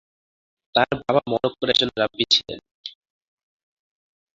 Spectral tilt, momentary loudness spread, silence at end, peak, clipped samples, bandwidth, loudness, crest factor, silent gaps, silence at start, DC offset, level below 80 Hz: -3.5 dB/octave; 19 LU; 1.45 s; -2 dBFS; under 0.1%; 7.8 kHz; -21 LUFS; 22 dB; 2.71-2.84 s; 0.75 s; under 0.1%; -58 dBFS